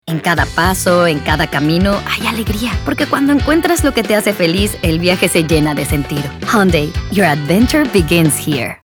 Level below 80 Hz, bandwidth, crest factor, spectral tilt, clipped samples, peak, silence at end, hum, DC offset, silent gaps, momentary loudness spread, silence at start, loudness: -28 dBFS; over 20 kHz; 14 dB; -5 dB/octave; under 0.1%; 0 dBFS; 0.1 s; none; under 0.1%; none; 5 LU; 0.05 s; -13 LUFS